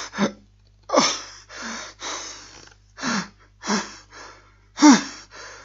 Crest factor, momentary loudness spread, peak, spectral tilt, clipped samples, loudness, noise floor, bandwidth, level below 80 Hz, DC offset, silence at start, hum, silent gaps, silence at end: 24 dB; 25 LU; 0 dBFS; -3 dB/octave; under 0.1%; -22 LUFS; -54 dBFS; 7.8 kHz; -58 dBFS; under 0.1%; 0 s; 50 Hz at -55 dBFS; none; 0.05 s